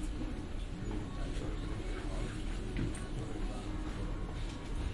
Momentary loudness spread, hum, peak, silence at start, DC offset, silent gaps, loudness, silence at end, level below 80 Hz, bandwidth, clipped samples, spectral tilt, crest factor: 3 LU; none; -22 dBFS; 0 s; under 0.1%; none; -41 LUFS; 0 s; -40 dBFS; 11.5 kHz; under 0.1%; -6 dB/octave; 16 dB